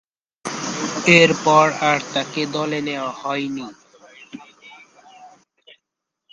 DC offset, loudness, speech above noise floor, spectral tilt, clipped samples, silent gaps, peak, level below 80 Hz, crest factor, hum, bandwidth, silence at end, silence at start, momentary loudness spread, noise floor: under 0.1%; -18 LUFS; 63 dB; -4 dB/octave; under 0.1%; none; 0 dBFS; -64 dBFS; 22 dB; none; 11 kHz; 1.05 s; 0.45 s; 25 LU; -82 dBFS